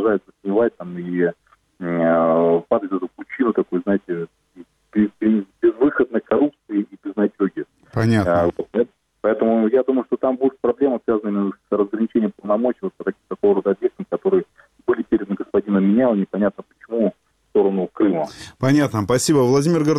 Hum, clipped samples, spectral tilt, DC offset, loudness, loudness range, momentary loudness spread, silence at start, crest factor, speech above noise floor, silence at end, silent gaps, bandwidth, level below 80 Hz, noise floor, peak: none; under 0.1%; -7 dB/octave; under 0.1%; -20 LUFS; 2 LU; 10 LU; 0 s; 14 dB; 29 dB; 0 s; none; 14 kHz; -56 dBFS; -46 dBFS; -6 dBFS